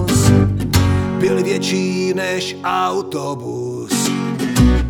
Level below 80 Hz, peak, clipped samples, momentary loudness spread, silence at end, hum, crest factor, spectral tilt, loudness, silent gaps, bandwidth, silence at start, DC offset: -28 dBFS; 0 dBFS; under 0.1%; 10 LU; 0 s; none; 16 dB; -5.5 dB/octave; -17 LUFS; none; 18.5 kHz; 0 s; under 0.1%